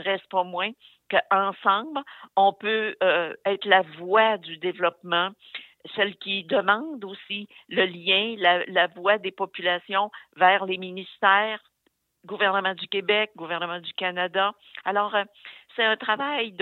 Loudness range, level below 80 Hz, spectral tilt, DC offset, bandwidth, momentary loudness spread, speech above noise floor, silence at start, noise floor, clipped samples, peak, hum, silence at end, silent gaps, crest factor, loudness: 3 LU; -84 dBFS; -6 dB/octave; under 0.1%; 4.4 kHz; 13 LU; 47 dB; 0 s; -72 dBFS; under 0.1%; -4 dBFS; none; 0 s; none; 20 dB; -24 LUFS